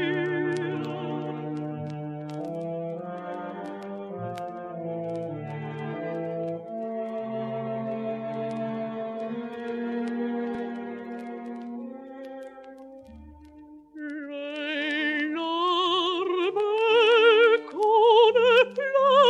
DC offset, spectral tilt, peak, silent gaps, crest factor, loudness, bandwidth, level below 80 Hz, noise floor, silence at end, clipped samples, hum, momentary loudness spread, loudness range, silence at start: under 0.1%; -6 dB/octave; -8 dBFS; none; 18 dB; -26 LUFS; 9 kHz; -66 dBFS; -49 dBFS; 0 s; under 0.1%; none; 18 LU; 15 LU; 0 s